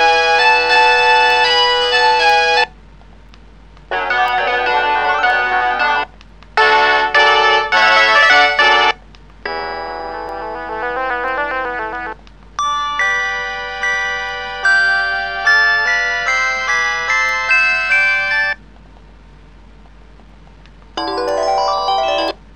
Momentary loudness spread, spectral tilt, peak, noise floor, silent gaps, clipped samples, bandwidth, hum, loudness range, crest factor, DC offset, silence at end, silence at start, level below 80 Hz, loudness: 14 LU; -1 dB/octave; 0 dBFS; -41 dBFS; none; under 0.1%; 10 kHz; none; 10 LU; 16 dB; 0.4%; 0.2 s; 0 s; -42 dBFS; -13 LUFS